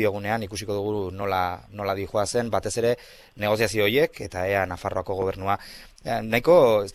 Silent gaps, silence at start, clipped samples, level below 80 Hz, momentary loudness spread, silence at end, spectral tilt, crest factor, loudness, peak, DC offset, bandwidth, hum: none; 0 s; under 0.1%; -50 dBFS; 11 LU; 0 s; -5 dB/octave; 20 dB; -24 LUFS; -6 dBFS; under 0.1%; 15 kHz; none